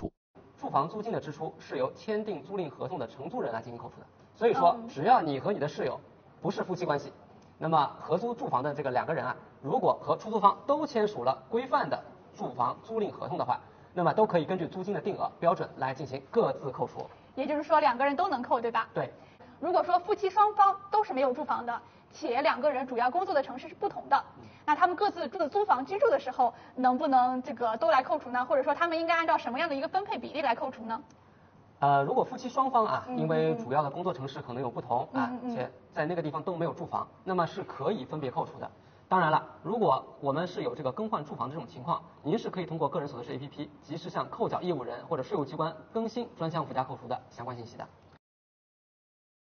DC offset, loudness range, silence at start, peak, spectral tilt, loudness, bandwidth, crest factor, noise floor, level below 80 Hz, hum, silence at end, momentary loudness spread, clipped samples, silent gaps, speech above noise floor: under 0.1%; 7 LU; 0 s; -8 dBFS; -4.5 dB/octave; -30 LUFS; 6.6 kHz; 22 dB; -58 dBFS; -70 dBFS; none; 1.6 s; 13 LU; under 0.1%; 0.17-0.34 s; 28 dB